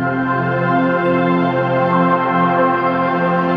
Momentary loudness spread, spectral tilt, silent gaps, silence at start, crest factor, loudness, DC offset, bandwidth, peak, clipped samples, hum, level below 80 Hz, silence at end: 3 LU; -9 dB/octave; none; 0 s; 14 dB; -15 LUFS; under 0.1%; 5.6 kHz; -2 dBFS; under 0.1%; none; -56 dBFS; 0 s